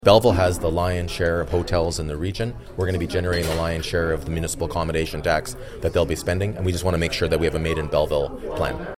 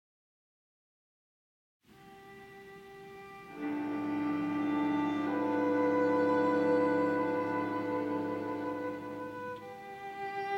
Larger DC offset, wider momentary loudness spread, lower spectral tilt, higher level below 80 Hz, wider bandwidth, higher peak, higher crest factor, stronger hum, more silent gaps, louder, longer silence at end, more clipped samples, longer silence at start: neither; second, 5 LU vs 21 LU; second, -5.5 dB/octave vs -7.5 dB/octave; first, -34 dBFS vs -74 dBFS; first, 16 kHz vs 8 kHz; first, 0 dBFS vs -18 dBFS; first, 22 dB vs 16 dB; neither; neither; first, -23 LUFS vs -32 LUFS; about the same, 0 s vs 0 s; neither; second, 0 s vs 2 s